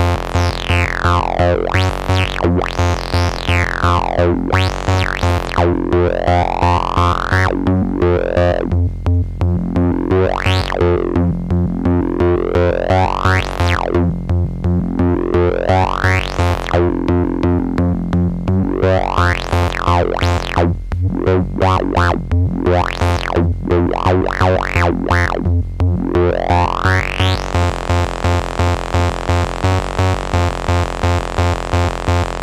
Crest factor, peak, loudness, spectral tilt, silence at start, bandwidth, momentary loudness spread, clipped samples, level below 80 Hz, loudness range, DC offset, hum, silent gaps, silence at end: 14 dB; 0 dBFS; -16 LUFS; -6.5 dB/octave; 0 s; 11 kHz; 3 LU; under 0.1%; -26 dBFS; 1 LU; under 0.1%; none; none; 0 s